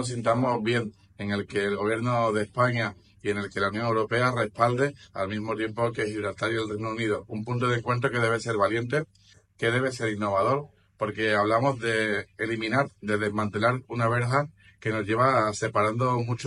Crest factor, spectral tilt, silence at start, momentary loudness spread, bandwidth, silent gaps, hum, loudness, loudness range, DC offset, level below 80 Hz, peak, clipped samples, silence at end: 20 dB; -6 dB/octave; 0 s; 7 LU; 11.5 kHz; none; none; -27 LUFS; 2 LU; under 0.1%; -62 dBFS; -8 dBFS; under 0.1%; 0 s